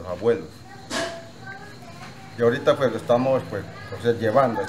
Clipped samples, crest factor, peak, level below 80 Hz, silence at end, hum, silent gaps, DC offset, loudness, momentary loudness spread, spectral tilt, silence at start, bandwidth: under 0.1%; 20 dB; -4 dBFS; -58 dBFS; 0 s; none; none; 0.4%; -23 LUFS; 20 LU; -5.5 dB/octave; 0 s; 15 kHz